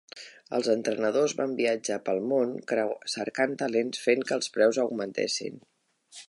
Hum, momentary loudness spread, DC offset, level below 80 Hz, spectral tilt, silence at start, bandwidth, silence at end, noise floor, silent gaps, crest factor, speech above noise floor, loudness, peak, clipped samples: none; 7 LU; under 0.1%; -80 dBFS; -3.5 dB/octave; 0.15 s; 11.5 kHz; 0.05 s; -53 dBFS; none; 18 dB; 26 dB; -28 LUFS; -10 dBFS; under 0.1%